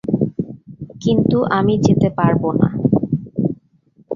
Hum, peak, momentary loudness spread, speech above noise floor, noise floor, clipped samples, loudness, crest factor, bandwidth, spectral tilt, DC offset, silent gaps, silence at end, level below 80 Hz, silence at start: none; 0 dBFS; 14 LU; 39 dB; -54 dBFS; under 0.1%; -17 LUFS; 16 dB; 7.4 kHz; -8 dB/octave; under 0.1%; none; 0 s; -46 dBFS; 0.05 s